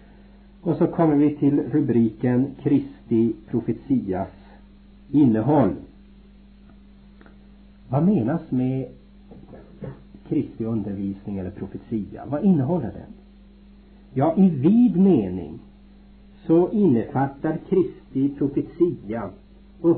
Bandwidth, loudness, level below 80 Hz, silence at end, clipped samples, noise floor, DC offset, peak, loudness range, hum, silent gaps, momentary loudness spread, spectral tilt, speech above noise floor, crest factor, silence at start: 4.3 kHz; -22 LUFS; -50 dBFS; 0 s; under 0.1%; -48 dBFS; under 0.1%; -8 dBFS; 6 LU; none; none; 15 LU; -13.5 dB/octave; 27 dB; 16 dB; 0.65 s